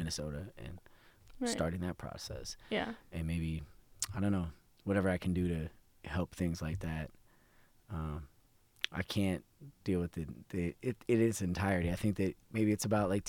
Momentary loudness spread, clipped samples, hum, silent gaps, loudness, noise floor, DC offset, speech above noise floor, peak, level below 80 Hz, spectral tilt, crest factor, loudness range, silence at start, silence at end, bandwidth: 13 LU; under 0.1%; none; none; -37 LUFS; -67 dBFS; under 0.1%; 31 dB; -12 dBFS; -52 dBFS; -5.5 dB/octave; 26 dB; 6 LU; 0 s; 0 s; 18 kHz